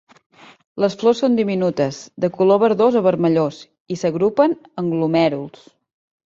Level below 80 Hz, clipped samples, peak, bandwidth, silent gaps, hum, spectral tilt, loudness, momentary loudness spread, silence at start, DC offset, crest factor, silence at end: -62 dBFS; under 0.1%; -2 dBFS; 7.8 kHz; 3.80-3.85 s; none; -7 dB/octave; -18 LUFS; 10 LU; 0.75 s; under 0.1%; 16 dB; 0.8 s